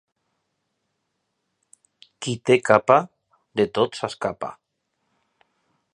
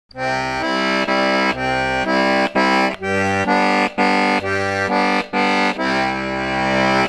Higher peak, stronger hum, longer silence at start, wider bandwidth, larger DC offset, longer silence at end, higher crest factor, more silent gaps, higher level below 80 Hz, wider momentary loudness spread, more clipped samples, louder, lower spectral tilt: first, 0 dBFS vs -4 dBFS; neither; first, 2.2 s vs 0.15 s; second, 11 kHz vs 12.5 kHz; neither; first, 1.4 s vs 0 s; first, 24 dB vs 14 dB; neither; second, -64 dBFS vs -46 dBFS; first, 17 LU vs 4 LU; neither; second, -21 LUFS vs -17 LUFS; about the same, -5 dB/octave vs -4.5 dB/octave